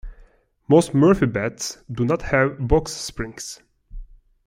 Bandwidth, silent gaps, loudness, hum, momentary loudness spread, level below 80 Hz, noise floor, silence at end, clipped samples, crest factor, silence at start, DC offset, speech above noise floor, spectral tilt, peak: 16 kHz; none; -21 LUFS; none; 14 LU; -36 dBFS; -52 dBFS; 0.4 s; under 0.1%; 18 dB; 0.05 s; under 0.1%; 32 dB; -6 dB/octave; -4 dBFS